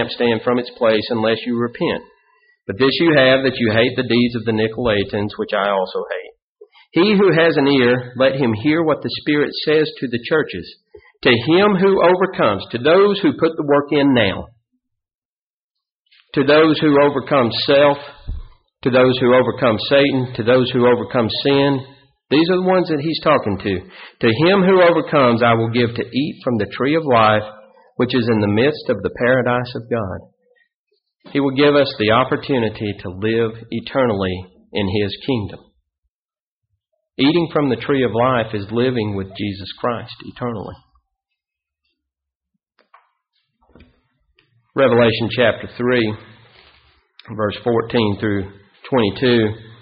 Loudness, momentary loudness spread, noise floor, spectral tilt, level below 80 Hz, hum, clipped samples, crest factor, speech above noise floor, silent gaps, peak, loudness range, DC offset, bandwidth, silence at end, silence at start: -17 LUFS; 12 LU; under -90 dBFS; -4 dB/octave; -48 dBFS; none; under 0.1%; 16 dB; over 74 dB; 6.42-6.56 s, 15.15-15.71 s, 15.92-16.05 s, 30.74-30.87 s, 35.98-36.03 s, 36.10-36.29 s, 36.40-36.61 s, 42.35-42.41 s; 0 dBFS; 6 LU; under 0.1%; 5.4 kHz; 0.1 s; 0 s